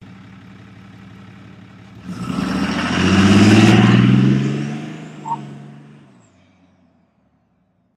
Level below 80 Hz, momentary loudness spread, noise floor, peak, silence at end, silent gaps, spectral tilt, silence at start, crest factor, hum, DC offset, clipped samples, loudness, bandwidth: -46 dBFS; 22 LU; -62 dBFS; 0 dBFS; 2.25 s; none; -6 dB/octave; 1.95 s; 18 dB; none; under 0.1%; under 0.1%; -14 LUFS; 11.5 kHz